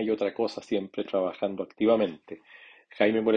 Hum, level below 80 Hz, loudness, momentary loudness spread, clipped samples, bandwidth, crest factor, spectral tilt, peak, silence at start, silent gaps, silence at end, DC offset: none; -70 dBFS; -28 LUFS; 13 LU; under 0.1%; 8 kHz; 20 dB; -6.5 dB/octave; -8 dBFS; 0 s; none; 0 s; under 0.1%